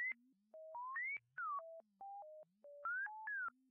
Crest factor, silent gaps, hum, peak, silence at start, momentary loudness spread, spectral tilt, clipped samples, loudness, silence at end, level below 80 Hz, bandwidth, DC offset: 10 dB; none; none; -38 dBFS; 0 s; 16 LU; 8 dB/octave; under 0.1%; -46 LUFS; 0.2 s; under -90 dBFS; 3.3 kHz; under 0.1%